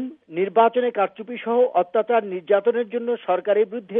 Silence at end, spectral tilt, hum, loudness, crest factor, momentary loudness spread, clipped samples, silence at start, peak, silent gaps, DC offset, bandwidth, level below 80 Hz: 0 s; -9 dB/octave; none; -21 LUFS; 16 dB; 7 LU; under 0.1%; 0 s; -6 dBFS; none; under 0.1%; 3.8 kHz; -82 dBFS